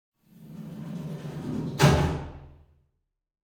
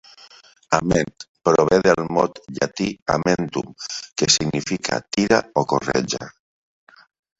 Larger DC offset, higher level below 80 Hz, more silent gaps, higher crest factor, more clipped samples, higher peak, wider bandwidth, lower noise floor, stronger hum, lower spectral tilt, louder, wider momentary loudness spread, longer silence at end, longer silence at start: neither; first, -42 dBFS vs -50 dBFS; second, none vs 1.29-1.35 s, 3.02-3.06 s; about the same, 22 dB vs 22 dB; neither; second, -6 dBFS vs 0 dBFS; first, 18.5 kHz vs 8.2 kHz; first, -77 dBFS vs -47 dBFS; neither; first, -6 dB/octave vs -4 dB/octave; second, -27 LUFS vs -21 LUFS; first, 22 LU vs 11 LU; second, 0.95 s vs 1.1 s; second, 0.35 s vs 0.7 s